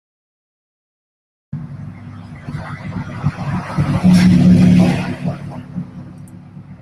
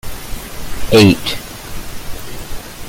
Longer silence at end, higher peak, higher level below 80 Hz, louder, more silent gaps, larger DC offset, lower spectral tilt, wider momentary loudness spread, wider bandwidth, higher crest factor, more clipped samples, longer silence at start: about the same, 0.05 s vs 0 s; about the same, 0 dBFS vs 0 dBFS; second, -40 dBFS vs -30 dBFS; about the same, -14 LUFS vs -12 LUFS; neither; neither; first, -8 dB/octave vs -5 dB/octave; first, 24 LU vs 20 LU; second, 11.5 kHz vs 17 kHz; about the same, 16 dB vs 16 dB; neither; first, 1.55 s vs 0.05 s